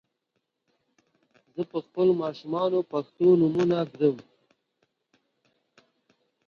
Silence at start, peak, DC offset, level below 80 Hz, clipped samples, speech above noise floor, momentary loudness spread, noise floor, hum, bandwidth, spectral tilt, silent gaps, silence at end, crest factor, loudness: 1.55 s; -10 dBFS; under 0.1%; -72 dBFS; under 0.1%; 55 dB; 12 LU; -80 dBFS; none; 6.8 kHz; -8.5 dB/octave; none; 2.25 s; 18 dB; -25 LUFS